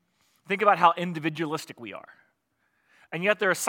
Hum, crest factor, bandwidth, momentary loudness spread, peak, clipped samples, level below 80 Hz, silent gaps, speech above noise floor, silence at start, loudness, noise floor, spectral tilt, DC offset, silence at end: none; 24 dB; 17 kHz; 20 LU; -4 dBFS; under 0.1%; -82 dBFS; none; 48 dB; 0.5 s; -25 LUFS; -73 dBFS; -4 dB/octave; under 0.1%; 0 s